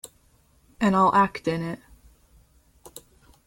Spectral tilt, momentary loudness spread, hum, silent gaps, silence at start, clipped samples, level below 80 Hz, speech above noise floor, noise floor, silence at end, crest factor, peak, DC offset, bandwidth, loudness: -6.5 dB/octave; 27 LU; none; none; 0.8 s; under 0.1%; -56 dBFS; 39 dB; -61 dBFS; 0.5 s; 18 dB; -8 dBFS; under 0.1%; 17 kHz; -23 LUFS